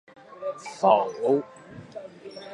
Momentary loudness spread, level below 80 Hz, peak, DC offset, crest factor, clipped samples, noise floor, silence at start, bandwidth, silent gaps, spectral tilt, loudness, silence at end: 21 LU; -72 dBFS; -4 dBFS; under 0.1%; 22 dB; under 0.1%; -42 dBFS; 0.3 s; 11.5 kHz; none; -5.5 dB/octave; -25 LUFS; 0 s